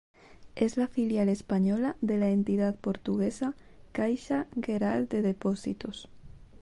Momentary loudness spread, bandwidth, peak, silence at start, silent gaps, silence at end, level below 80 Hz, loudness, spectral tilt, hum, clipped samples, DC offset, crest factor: 10 LU; 11 kHz; -14 dBFS; 0.3 s; none; 0.05 s; -58 dBFS; -30 LUFS; -7.5 dB/octave; none; under 0.1%; under 0.1%; 16 dB